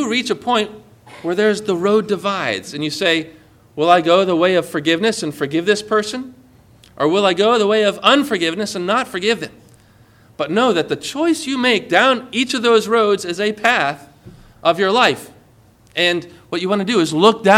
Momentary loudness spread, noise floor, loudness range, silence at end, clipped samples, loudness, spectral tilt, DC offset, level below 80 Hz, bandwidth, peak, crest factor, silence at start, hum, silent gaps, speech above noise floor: 10 LU; -50 dBFS; 3 LU; 0 s; under 0.1%; -17 LUFS; -4 dB/octave; under 0.1%; -58 dBFS; 16 kHz; 0 dBFS; 18 dB; 0 s; none; none; 33 dB